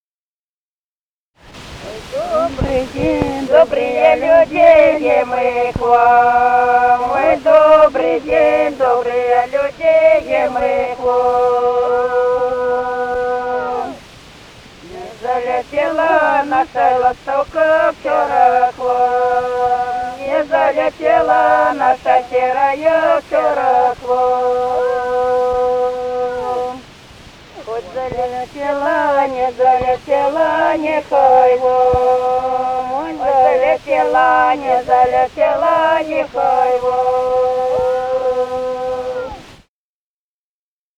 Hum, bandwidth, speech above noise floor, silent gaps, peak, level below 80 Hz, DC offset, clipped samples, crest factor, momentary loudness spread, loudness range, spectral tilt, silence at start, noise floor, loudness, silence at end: none; 10.5 kHz; over 77 dB; none; 0 dBFS; -42 dBFS; under 0.1%; under 0.1%; 14 dB; 10 LU; 8 LU; -5.5 dB/octave; 1.45 s; under -90 dBFS; -14 LUFS; 1.45 s